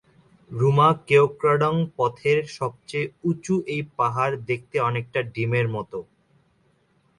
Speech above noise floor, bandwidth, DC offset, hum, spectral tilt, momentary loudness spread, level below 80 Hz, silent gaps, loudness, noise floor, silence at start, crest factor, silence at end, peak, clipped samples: 41 dB; 11 kHz; under 0.1%; none; -7 dB/octave; 12 LU; -60 dBFS; none; -23 LUFS; -64 dBFS; 0.5 s; 18 dB; 1.15 s; -6 dBFS; under 0.1%